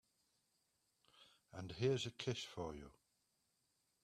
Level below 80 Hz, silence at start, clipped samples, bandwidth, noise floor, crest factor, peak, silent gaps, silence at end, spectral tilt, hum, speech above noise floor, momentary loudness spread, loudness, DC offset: -72 dBFS; 1.15 s; under 0.1%; 13.5 kHz; -84 dBFS; 22 dB; -26 dBFS; none; 1.1 s; -5 dB/octave; none; 41 dB; 18 LU; -44 LUFS; under 0.1%